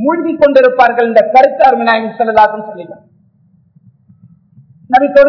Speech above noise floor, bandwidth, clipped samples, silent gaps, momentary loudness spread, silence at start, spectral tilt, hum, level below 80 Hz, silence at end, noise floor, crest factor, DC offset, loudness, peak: 41 dB; 5.4 kHz; 3%; none; 15 LU; 0 s; -6.5 dB/octave; none; -50 dBFS; 0 s; -50 dBFS; 10 dB; under 0.1%; -9 LUFS; 0 dBFS